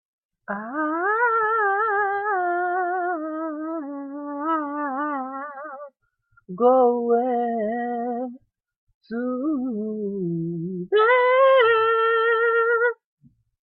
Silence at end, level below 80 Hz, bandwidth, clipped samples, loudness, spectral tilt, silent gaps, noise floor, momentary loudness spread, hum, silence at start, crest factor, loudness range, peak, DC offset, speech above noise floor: 0.7 s; -74 dBFS; 4.3 kHz; under 0.1%; -22 LUFS; -10 dB/octave; 8.76-8.87 s, 8.94-9.01 s; -63 dBFS; 16 LU; none; 0.5 s; 16 dB; 9 LU; -6 dBFS; under 0.1%; 42 dB